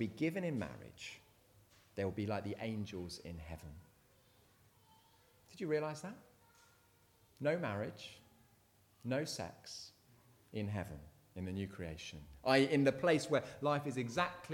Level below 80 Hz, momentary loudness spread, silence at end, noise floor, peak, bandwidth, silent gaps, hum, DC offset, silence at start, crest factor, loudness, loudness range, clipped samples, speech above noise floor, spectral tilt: -66 dBFS; 20 LU; 0 s; -70 dBFS; -16 dBFS; 19 kHz; none; none; under 0.1%; 0 s; 24 dB; -39 LUFS; 11 LU; under 0.1%; 32 dB; -5.5 dB/octave